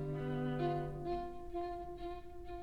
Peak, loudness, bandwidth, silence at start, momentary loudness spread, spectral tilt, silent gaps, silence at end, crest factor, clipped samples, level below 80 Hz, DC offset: -26 dBFS; -41 LUFS; 9.2 kHz; 0 s; 10 LU; -8.5 dB/octave; none; 0 s; 14 dB; under 0.1%; -54 dBFS; under 0.1%